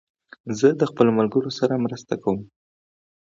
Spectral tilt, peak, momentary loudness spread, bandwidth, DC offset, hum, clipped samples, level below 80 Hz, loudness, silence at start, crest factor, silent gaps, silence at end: -6.5 dB/octave; -2 dBFS; 11 LU; 7.6 kHz; under 0.1%; none; under 0.1%; -62 dBFS; -22 LUFS; 0.45 s; 20 dB; none; 0.8 s